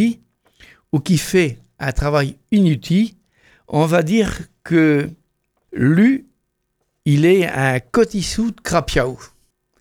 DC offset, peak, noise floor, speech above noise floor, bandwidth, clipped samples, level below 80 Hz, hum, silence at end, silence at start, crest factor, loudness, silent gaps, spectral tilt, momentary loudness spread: under 0.1%; -2 dBFS; -71 dBFS; 55 dB; 17.5 kHz; under 0.1%; -36 dBFS; none; 0.55 s; 0 s; 16 dB; -18 LUFS; none; -6 dB/octave; 11 LU